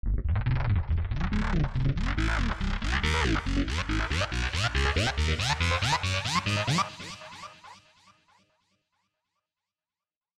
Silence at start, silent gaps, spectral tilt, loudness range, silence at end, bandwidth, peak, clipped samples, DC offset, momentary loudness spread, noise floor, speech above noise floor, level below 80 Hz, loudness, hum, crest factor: 0.05 s; none; -4.5 dB/octave; 6 LU; 2.65 s; 13 kHz; -12 dBFS; under 0.1%; under 0.1%; 5 LU; under -90 dBFS; over 63 dB; -34 dBFS; -28 LUFS; none; 16 dB